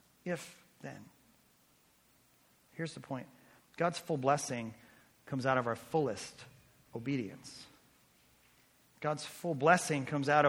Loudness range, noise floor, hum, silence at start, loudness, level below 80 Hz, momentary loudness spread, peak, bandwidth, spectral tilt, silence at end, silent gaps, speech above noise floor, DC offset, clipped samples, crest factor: 11 LU; -69 dBFS; none; 0.25 s; -35 LUFS; -76 dBFS; 22 LU; -10 dBFS; over 20 kHz; -5 dB/octave; 0 s; none; 35 dB; under 0.1%; under 0.1%; 26 dB